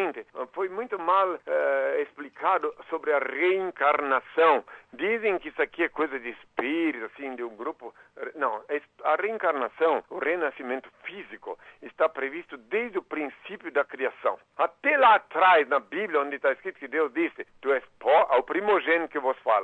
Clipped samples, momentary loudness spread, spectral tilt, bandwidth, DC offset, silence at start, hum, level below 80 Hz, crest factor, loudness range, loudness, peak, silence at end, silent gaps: under 0.1%; 15 LU; -5.5 dB/octave; 8 kHz; under 0.1%; 0 s; none; -72 dBFS; 16 dB; 7 LU; -26 LUFS; -10 dBFS; 0 s; none